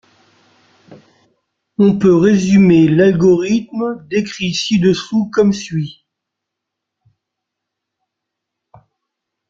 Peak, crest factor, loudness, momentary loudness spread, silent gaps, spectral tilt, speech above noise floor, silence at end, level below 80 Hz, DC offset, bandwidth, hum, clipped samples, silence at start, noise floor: -2 dBFS; 14 dB; -13 LUFS; 12 LU; none; -6.5 dB/octave; 67 dB; 3.55 s; -50 dBFS; under 0.1%; 7.6 kHz; none; under 0.1%; 0.9 s; -79 dBFS